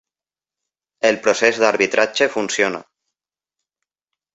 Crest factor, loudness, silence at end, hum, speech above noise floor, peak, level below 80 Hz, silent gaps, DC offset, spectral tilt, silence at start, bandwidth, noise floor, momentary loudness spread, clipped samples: 20 dB; -17 LUFS; 1.55 s; none; over 73 dB; 0 dBFS; -64 dBFS; none; under 0.1%; -2.5 dB/octave; 1.05 s; 8.2 kHz; under -90 dBFS; 5 LU; under 0.1%